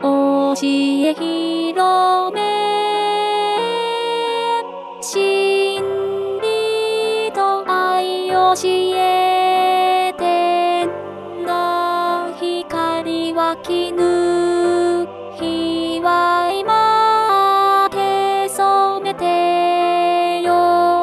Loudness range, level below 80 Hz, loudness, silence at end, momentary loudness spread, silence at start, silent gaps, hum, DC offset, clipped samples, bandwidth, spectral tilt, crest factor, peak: 4 LU; -60 dBFS; -17 LUFS; 0 s; 7 LU; 0 s; none; none; under 0.1%; under 0.1%; 13.5 kHz; -3.5 dB/octave; 14 dB; -4 dBFS